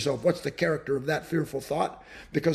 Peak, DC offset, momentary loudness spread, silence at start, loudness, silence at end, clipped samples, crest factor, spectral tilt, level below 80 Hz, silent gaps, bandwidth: -10 dBFS; under 0.1%; 5 LU; 0 s; -29 LUFS; 0 s; under 0.1%; 18 dB; -6 dB/octave; -58 dBFS; none; 13.5 kHz